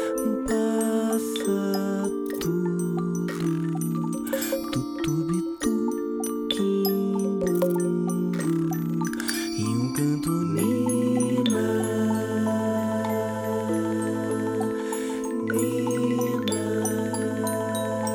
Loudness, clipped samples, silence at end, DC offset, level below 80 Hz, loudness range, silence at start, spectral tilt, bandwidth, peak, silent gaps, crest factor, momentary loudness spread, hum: -26 LUFS; under 0.1%; 0 s; under 0.1%; -56 dBFS; 3 LU; 0 s; -5.5 dB/octave; 18 kHz; -10 dBFS; none; 16 dB; 4 LU; none